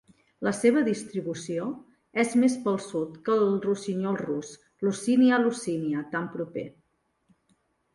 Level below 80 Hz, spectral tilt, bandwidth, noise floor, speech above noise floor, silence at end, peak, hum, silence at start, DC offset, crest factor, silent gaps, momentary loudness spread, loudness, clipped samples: -70 dBFS; -5.5 dB/octave; 11.5 kHz; -72 dBFS; 46 dB; 1.25 s; -10 dBFS; none; 0.4 s; under 0.1%; 18 dB; none; 12 LU; -27 LUFS; under 0.1%